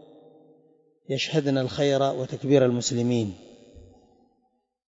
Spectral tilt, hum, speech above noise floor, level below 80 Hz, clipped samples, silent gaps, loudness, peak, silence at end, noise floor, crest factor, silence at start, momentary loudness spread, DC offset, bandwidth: -5.5 dB/octave; none; 48 dB; -62 dBFS; under 0.1%; none; -24 LUFS; -6 dBFS; 1.15 s; -72 dBFS; 20 dB; 1.1 s; 11 LU; under 0.1%; 8 kHz